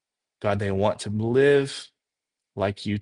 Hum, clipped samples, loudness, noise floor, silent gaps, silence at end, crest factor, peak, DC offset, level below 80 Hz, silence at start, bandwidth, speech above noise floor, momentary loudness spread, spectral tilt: none; under 0.1%; -24 LUFS; -87 dBFS; none; 0 s; 18 dB; -8 dBFS; under 0.1%; -60 dBFS; 0.4 s; 11 kHz; 64 dB; 13 LU; -6 dB/octave